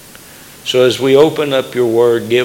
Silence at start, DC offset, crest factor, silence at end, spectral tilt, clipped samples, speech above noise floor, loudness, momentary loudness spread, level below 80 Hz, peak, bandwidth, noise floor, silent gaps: 0.65 s; under 0.1%; 12 dB; 0 s; -5 dB/octave; under 0.1%; 26 dB; -12 LUFS; 6 LU; -56 dBFS; 0 dBFS; 17.5 kHz; -37 dBFS; none